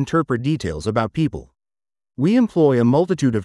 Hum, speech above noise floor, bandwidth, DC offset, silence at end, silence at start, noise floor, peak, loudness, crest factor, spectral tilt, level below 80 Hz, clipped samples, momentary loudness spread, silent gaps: none; over 72 dB; 11.5 kHz; under 0.1%; 0 s; 0 s; under -90 dBFS; -4 dBFS; -19 LUFS; 16 dB; -7.5 dB/octave; -48 dBFS; under 0.1%; 8 LU; none